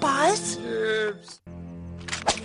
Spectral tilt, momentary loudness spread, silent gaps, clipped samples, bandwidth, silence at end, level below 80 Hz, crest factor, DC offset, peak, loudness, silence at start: -3 dB/octave; 19 LU; none; under 0.1%; 11.5 kHz; 0 s; -54 dBFS; 18 dB; under 0.1%; -8 dBFS; -25 LUFS; 0 s